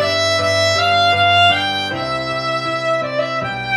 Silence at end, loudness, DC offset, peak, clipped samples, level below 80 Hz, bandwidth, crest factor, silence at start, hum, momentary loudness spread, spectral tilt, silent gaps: 0 s; -15 LUFS; under 0.1%; -2 dBFS; under 0.1%; -52 dBFS; 13.5 kHz; 14 dB; 0 s; none; 9 LU; -3 dB/octave; none